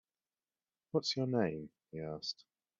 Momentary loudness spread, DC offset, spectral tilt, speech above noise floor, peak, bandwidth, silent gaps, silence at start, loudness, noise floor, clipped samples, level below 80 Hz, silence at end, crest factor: 14 LU; under 0.1%; -4.5 dB/octave; over 53 dB; -20 dBFS; 7.8 kHz; none; 0.95 s; -38 LUFS; under -90 dBFS; under 0.1%; -74 dBFS; 0.45 s; 20 dB